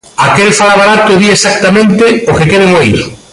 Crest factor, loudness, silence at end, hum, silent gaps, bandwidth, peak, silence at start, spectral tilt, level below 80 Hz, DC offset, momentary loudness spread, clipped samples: 6 dB; -6 LUFS; 0.15 s; none; none; 11.5 kHz; 0 dBFS; 0.2 s; -4.5 dB/octave; -34 dBFS; under 0.1%; 3 LU; under 0.1%